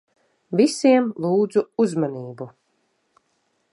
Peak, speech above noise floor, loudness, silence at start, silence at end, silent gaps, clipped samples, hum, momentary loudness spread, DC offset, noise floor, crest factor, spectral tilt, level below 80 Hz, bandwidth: -4 dBFS; 49 dB; -20 LUFS; 0.5 s; 1.25 s; none; under 0.1%; none; 18 LU; under 0.1%; -69 dBFS; 18 dB; -6 dB/octave; -76 dBFS; 11.5 kHz